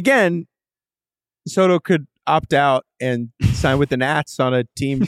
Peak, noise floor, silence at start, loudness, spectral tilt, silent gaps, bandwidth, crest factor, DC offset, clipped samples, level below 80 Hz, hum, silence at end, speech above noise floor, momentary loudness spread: -4 dBFS; under -90 dBFS; 0 s; -19 LUFS; -6 dB/octave; none; 14.5 kHz; 16 dB; under 0.1%; under 0.1%; -40 dBFS; none; 0 s; over 72 dB; 7 LU